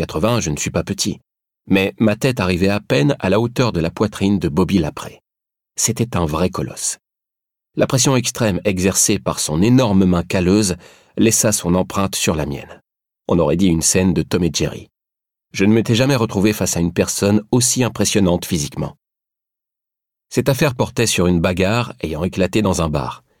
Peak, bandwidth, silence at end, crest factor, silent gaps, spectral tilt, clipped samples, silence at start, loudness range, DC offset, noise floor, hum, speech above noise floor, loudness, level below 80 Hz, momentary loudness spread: -2 dBFS; 17 kHz; 0.25 s; 16 dB; none; -4.5 dB/octave; under 0.1%; 0 s; 4 LU; under 0.1%; -85 dBFS; none; 68 dB; -17 LUFS; -40 dBFS; 9 LU